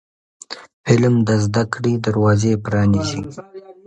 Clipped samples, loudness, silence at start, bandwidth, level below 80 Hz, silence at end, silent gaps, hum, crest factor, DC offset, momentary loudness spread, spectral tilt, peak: under 0.1%; -17 LUFS; 0.5 s; 9 kHz; -44 dBFS; 0.15 s; 0.73-0.84 s; none; 18 dB; under 0.1%; 19 LU; -6.5 dB/octave; 0 dBFS